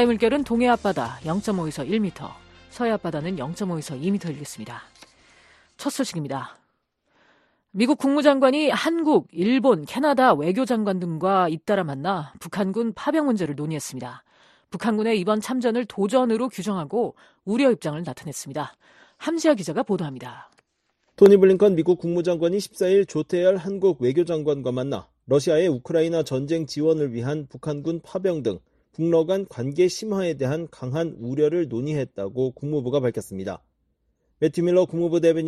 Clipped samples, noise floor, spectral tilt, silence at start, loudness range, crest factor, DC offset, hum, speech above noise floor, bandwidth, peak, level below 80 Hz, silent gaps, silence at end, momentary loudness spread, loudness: under 0.1%; -71 dBFS; -6 dB/octave; 0 s; 8 LU; 20 dB; under 0.1%; none; 49 dB; 13 kHz; -2 dBFS; -60 dBFS; none; 0 s; 13 LU; -23 LUFS